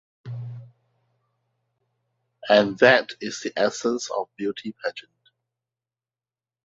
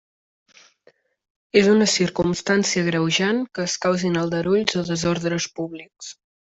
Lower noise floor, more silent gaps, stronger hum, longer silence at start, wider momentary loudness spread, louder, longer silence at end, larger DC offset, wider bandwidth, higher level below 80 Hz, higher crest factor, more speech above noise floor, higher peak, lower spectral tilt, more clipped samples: first, under -90 dBFS vs -59 dBFS; neither; neither; second, 0.25 s vs 1.55 s; first, 22 LU vs 15 LU; about the same, -22 LUFS vs -21 LUFS; first, 1.65 s vs 0.35 s; neither; about the same, 8 kHz vs 8.2 kHz; second, -68 dBFS vs -56 dBFS; first, 26 dB vs 20 dB; first, over 68 dB vs 38 dB; about the same, -2 dBFS vs -2 dBFS; about the same, -4 dB/octave vs -4 dB/octave; neither